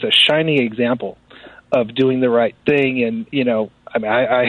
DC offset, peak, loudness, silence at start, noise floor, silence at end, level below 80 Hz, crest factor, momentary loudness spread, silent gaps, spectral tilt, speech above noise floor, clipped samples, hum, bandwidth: under 0.1%; -4 dBFS; -17 LUFS; 0 s; -43 dBFS; 0 s; -56 dBFS; 14 dB; 10 LU; none; -5.5 dB/octave; 26 dB; under 0.1%; none; 10.5 kHz